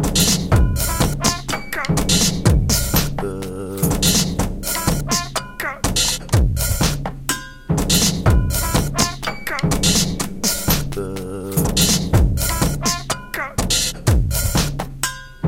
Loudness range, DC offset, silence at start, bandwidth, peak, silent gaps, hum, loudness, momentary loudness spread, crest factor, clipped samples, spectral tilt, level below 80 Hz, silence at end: 2 LU; under 0.1%; 0 s; 17 kHz; 0 dBFS; none; none; -19 LUFS; 9 LU; 18 dB; under 0.1%; -3.5 dB/octave; -26 dBFS; 0 s